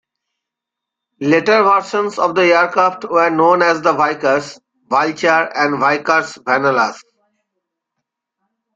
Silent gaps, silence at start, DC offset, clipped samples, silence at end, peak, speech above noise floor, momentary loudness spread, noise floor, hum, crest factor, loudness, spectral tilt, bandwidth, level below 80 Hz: none; 1.2 s; under 0.1%; under 0.1%; 1.75 s; -2 dBFS; 68 dB; 6 LU; -83 dBFS; none; 14 dB; -14 LUFS; -4.5 dB/octave; 8 kHz; -64 dBFS